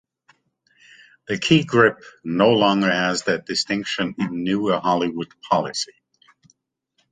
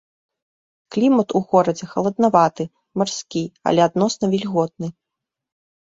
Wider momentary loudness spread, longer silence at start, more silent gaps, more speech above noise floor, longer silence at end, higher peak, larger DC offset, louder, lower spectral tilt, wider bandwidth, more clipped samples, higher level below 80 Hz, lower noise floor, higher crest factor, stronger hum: about the same, 11 LU vs 11 LU; first, 1.3 s vs 0.9 s; neither; second, 50 dB vs 65 dB; first, 1.25 s vs 0.95 s; about the same, -2 dBFS vs -2 dBFS; neither; about the same, -20 LUFS vs -19 LUFS; second, -4.5 dB/octave vs -6 dB/octave; first, 9.6 kHz vs 7.8 kHz; neither; about the same, -60 dBFS vs -62 dBFS; second, -70 dBFS vs -84 dBFS; about the same, 20 dB vs 18 dB; neither